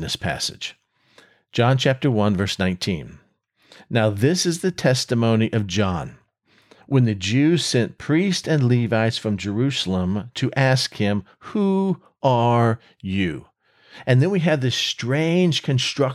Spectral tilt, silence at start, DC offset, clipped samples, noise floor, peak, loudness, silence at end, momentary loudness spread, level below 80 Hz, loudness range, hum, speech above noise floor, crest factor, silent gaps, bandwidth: -5.5 dB/octave; 0 s; under 0.1%; under 0.1%; -62 dBFS; -6 dBFS; -21 LUFS; 0 s; 8 LU; -54 dBFS; 2 LU; none; 41 dB; 16 dB; none; 13 kHz